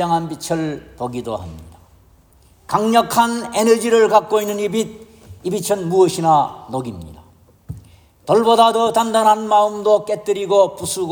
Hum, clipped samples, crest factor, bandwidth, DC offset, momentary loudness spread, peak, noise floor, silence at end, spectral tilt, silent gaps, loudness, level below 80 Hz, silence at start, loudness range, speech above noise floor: none; under 0.1%; 16 dB; over 20 kHz; under 0.1%; 15 LU; -2 dBFS; -51 dBFS; 0 s; -4.5 dB/octave; none; -17 LUFS; -52 dBFS; 0 s; 5 LU; 35 dB